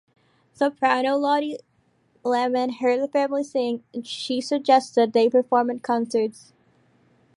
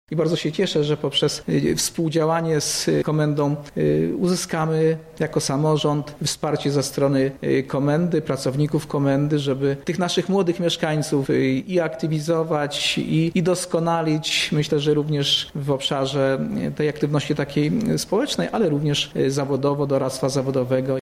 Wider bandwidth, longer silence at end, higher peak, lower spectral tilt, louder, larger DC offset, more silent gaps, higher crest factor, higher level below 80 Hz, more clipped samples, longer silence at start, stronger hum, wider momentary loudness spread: second, 11.5 kHz vs 15.5 kHz; first, 1.05 s vs 0 s; about the same, -6 dBFS vs -8 dBFS; about the same, -4 dB/octave vs -5 dB/octave; about the same, -23 LUFS vs -21 LUFS; neither; neither; first, 18 dB vs 12 dB; second, -76 dBFS vs -52 dBFS; neither; first, 0.6 s vs 0.1 s; neither; first, 11 LU vs 3 LU